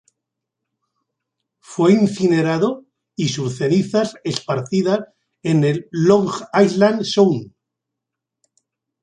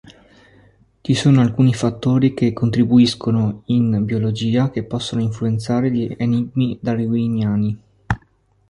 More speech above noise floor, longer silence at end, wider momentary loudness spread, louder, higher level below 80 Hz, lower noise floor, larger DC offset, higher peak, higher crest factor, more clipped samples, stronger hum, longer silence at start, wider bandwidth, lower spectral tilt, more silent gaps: first, 66 dB vs 40 dB; first, 1.55 s vs 0.55 s; about the same, 10 LU vs 9 LU; about the same, -18 LUFS vs -18 LUFS; second, -62 dBFS vs -46 dBFS; first, -82 dBFS vs -57 dBFS; neither; about the same, -2 dBFS vs -2 dBFS; about the same, 18 dB vs 16 dB; neither; neither; first, 1.7 s vs 1.05 s; second, 9.8 kHz vs 11.5 kHz; about the same, -6 dB/octave vs -7 dB/octave; neither